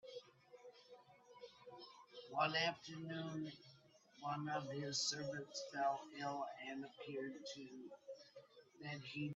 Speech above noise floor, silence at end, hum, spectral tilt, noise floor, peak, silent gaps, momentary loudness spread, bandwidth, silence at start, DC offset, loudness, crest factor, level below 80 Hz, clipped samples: 23 dB; 0 s; none; -3.5 dB/octave; -68 dBFS; -24 dBFS; none; 22 LU; 8.4 kHz; 0.05 s; under 0.1%; -45 LUFS; 22 dB; -88 dBFS; under 0.1%